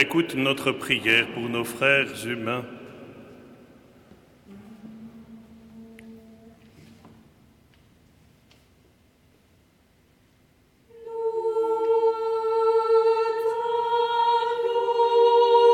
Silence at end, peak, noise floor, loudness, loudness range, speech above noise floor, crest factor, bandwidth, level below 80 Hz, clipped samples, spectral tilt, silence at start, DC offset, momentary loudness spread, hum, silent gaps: 0 s; -4 dBFS; -61 dBFS; -23 LUFS; 25 LU; 36 dB; 20 dB; 15 kHz; -66 dBFS; under 0.1%; -4.5 dB/octave; 0 s; under 0.1%; 25 LU; none; none